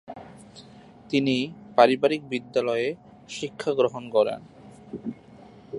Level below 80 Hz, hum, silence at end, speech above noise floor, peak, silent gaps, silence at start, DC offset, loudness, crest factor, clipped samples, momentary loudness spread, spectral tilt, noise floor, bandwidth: -66 dBFS; none; 0 s; 25 dB; -2 dBFS; none; 0.1 s; under 0.1%; -25 LUFS; 24 dB; under 0.1%; 22 LU; -5.5 dB/octave; -49 dBFS; 11 kHz